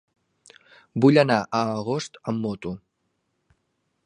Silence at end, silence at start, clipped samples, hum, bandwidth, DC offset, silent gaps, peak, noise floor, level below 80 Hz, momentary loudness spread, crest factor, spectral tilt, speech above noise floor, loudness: 1.3 s; 0.95 s; under 0.1%; none; 10.5 kHz; under 0.1%; none; -2 dBFS; -74 dBFS; -62 dBFS; 17 LU; 22 dB; -6.5 dB/octave; 52 dB; -23 LUFS